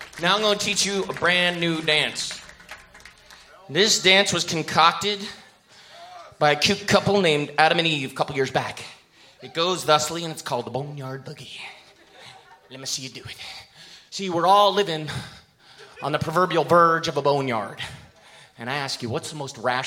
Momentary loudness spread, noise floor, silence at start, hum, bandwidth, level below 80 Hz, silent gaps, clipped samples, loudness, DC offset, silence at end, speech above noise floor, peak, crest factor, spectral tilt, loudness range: 19 LU; -51 dBFS; 0 s; none; 17 kHz; -60 dBFS; none; under 0.1%; -21 LUFS; under 0.1%; 0 s; 28 dB; 0 dBFS; 24 dB; -3 dB/octave; 7 LU